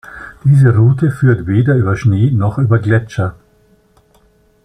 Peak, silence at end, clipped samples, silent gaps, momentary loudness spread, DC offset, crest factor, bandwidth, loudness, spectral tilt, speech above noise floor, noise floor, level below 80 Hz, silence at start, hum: -2 dBFS; 1.35 s; under 0.1%; none; 10 LU; under 0.1%; 12 dB; 9.6 kHz; -13 LUFS; -9 dB/octave; 41 dB; -52 dBFS; -42 dBFS; 0.1 s; none